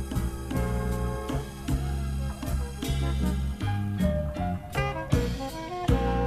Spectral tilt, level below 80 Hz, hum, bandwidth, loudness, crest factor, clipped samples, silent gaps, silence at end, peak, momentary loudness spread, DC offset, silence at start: -6.5 dB/octave; -32 dBFS; none; 15 kHz; -30 LUFS; 18 dB; under 0.1%; none; 0 s; -10 dBFS; 5 LU; under 0.1%; 0 s